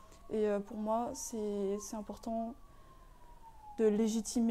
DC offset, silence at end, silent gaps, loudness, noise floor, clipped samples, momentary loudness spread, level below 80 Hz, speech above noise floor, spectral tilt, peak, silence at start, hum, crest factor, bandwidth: under 0.1%; 0 s; none; -36 LUFS; -56 dBFS; under 0.1%; 12 LU; -58 dBFS; 22 dB; -5.5 dB/octave; -20 dBFS; 0 s; none; 18 dB; 15 kHz